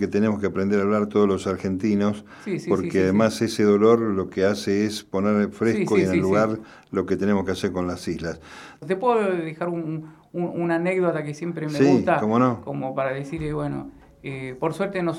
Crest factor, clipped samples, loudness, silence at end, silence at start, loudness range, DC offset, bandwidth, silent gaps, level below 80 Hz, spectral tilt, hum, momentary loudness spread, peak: 18 dB; under 0.1%; -23 LUFS; 0 s; 0 s; 4 LU; under 0.1%; 14 kHz; none; -54 dBFS; -6.5 dB/octave; none; 12 LU; -4 dBFS